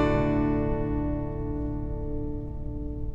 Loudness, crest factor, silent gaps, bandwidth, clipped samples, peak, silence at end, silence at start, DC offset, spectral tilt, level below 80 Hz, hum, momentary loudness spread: -30 LUFS; 16 dB; none; 7.6 kHz; under 0.1%; -12 dBFS; 0 s; 0 s; under 0.1%; -9.5 dB/octave; -34 dBFS; none; 11 LU